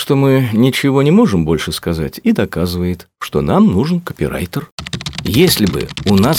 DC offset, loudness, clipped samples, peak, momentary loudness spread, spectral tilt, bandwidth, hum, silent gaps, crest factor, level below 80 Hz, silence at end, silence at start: under 0.1%; -14 LUFS; under 0.1%; 0 dBFS; 11 LU; -6 dB/octave; 18 kHz; none; 4.72-4.78 s; 14 dB; -36 dBFS; 0 s; 0 s